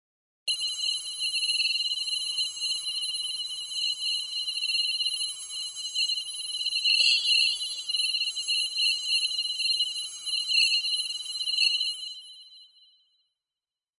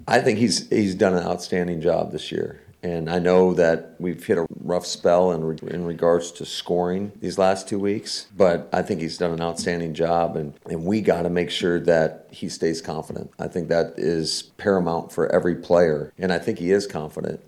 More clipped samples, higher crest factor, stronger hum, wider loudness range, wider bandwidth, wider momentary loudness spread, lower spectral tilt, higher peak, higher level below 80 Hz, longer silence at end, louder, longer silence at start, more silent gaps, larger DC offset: neither; about the same, 20 dB vs 18 dB; neither; about the same, 4 LU vs 2 LU; second, 11.5 kHz vs 14 kHz; about the same, 9 LU vs 11 LU; second, 5.5 dB/octave vs -5.5 dB/octave; second, -10 dBFS vs -4 dBFS; second, -82 dBFS vs -54 dBFS; first, 1.3 s vs 0.1 s; about the same, -25 LUFS vs -23 LUFS; first, 0.45 s vs 0 s; neither; neither